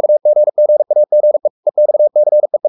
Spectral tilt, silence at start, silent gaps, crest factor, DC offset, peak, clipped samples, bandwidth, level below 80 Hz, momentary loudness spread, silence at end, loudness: -11.5 dB/octave; 0 s; 1.50-1.63 s; 6 dB; under 0.1%; -4 dBFS; under 0.1%; 1.1 kHz; -80 dBFS; 3 LU; 0 s; -12 LUFS